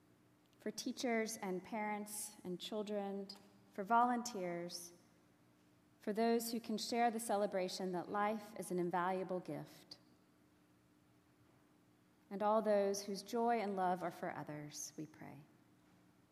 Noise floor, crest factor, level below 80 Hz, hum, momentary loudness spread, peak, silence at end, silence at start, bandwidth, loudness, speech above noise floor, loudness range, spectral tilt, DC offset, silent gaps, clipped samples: -71 dBFS; 20 dB; -90 dBFS; none; 16 LU; -22 dBFS; 0.85 s; 0.65 s; 15 kHz; -40 LUFS; 31 dB; 5 LU; -4.5 dB/octave; under 0.1%; none; under 0.1%